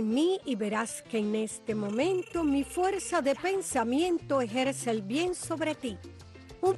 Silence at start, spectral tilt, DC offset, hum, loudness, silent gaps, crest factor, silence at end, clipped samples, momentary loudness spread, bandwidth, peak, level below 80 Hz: 0 s; -4.5 dB/octave; under 0.1%; none; -30 LUFS; none; 14 dB; 0 s; under 0.1%; 6 LU; 12.5 kHz; -16 dBFS; -58 dBFS